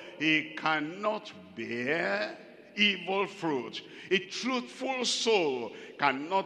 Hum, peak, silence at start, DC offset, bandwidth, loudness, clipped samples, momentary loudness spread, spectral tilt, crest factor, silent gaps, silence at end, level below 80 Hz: none; -8 dBFS; 0 s; under 0.1%; 11.5 kHz; -30 LUFS; under 0.1%; 14 LU; -3 dB/octave; 22 dB; none; 0 s; -84 dBFS